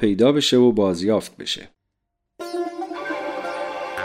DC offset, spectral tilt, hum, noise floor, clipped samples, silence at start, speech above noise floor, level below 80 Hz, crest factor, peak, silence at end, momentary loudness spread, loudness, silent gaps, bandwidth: under 0.1%; -5 dB/octave; none; -77 dBFS; under 0.1%; 0 s; 59 dB; -56 dBFS; 16 dB; -6 dBFS; 0 s; 13 LU; -21 LUFS; none; 15 kHz